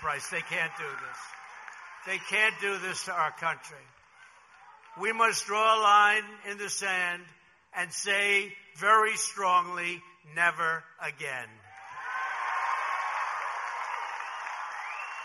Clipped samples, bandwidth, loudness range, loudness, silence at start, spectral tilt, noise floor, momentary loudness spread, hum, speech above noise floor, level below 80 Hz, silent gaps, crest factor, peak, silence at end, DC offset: under 0.1%; 13 kHz; 7 LU; -28 LUFS; 0 s; -1 dB/octave; -56 dBFS; 17 LU; none; 28 dB; -76 dBFS; none; 20 dB; -10 dBFS; 0 s; under 0.1%